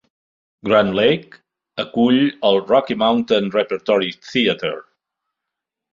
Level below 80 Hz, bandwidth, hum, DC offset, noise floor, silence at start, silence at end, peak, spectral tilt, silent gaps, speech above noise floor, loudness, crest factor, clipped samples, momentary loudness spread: -58 dBFS; 7.4 kHz; none; under 0.1%; -83 dBFS; 0.65 s; 1.1 s; -2 dBFS; -6.5 dB/octave; none; 66 dB; -18 LUFS; 18 dB; under 0.1%; 11 LU